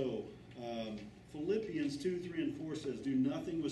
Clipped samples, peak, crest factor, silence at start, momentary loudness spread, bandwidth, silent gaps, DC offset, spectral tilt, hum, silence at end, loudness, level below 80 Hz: under 0.1%; -24 dBFS; 14 dB; 0 s; 12 LU; 12 kHz; none; under 0.1%; -6.5 dB/octave; none; 0 s; -39 LUFS; -66 dBFS